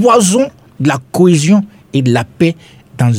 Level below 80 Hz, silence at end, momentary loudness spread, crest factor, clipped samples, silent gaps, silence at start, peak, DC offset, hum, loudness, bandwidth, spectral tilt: -50 dBFS; 0 s; 9 LU; 12 dB; under 0.1%; none; 0 s; 0 dBFS; under 0.1%; none; -12 LUFS; 16 kHz; -5.5 dB/octave